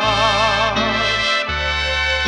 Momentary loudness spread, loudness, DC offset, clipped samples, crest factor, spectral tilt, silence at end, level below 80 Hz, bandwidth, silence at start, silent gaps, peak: 3 LU; -16 LUFS; under 0.1%; under 0.1%; 16 dB; -3 dB/octave; 0 s; -32 dBFS; 11.5 kHz; 0 s; none; -2 dBFS